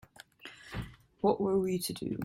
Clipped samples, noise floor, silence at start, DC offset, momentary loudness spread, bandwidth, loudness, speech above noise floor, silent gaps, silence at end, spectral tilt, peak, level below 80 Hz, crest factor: under 0.1%; -53 dBFS; 0.45 s; under 0.1%; 20 LU; 16.5 kHz; -33 LUFS; 22 dB; none; 0 s; -5.5 dB/octave; -14 dBFS; -56 dBFS; 20 dB